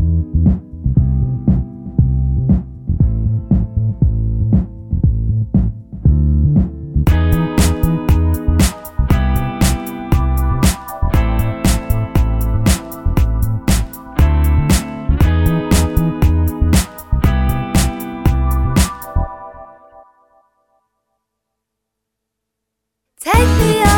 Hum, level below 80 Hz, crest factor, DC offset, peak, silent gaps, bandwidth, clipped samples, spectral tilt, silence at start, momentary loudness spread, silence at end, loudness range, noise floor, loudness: none; -18 dBFS; 14 dB; under 0.1%; 0 dBFS; none; 19 kHz; under 0.1%; -6 dB/octave; 0 s; 6 LU; 0 s; 5 LU; -78 dBFS; -16 LUFS